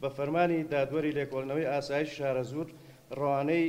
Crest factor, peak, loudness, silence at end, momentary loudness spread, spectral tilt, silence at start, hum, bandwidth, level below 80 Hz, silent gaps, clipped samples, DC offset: 18 dB; -14 dBFS; -31 LUFS; 0 s; 9 LU; -7 dB/octave; 0 s; none; 16 kHz; -64 dBFS; none; under 0.1%; under 0.1%